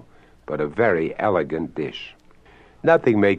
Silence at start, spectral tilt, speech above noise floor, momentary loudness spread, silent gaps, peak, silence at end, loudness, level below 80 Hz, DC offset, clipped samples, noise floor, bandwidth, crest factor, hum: 0.5 s; -8 dB/octave; 30 dB; 14 LU; none; -4 dBFS; 0 s; -22 LUFS; -54 dBFS; under 0.1%; under 0.1%; -50 dBFS; 7.8 kHz; 18 dB; none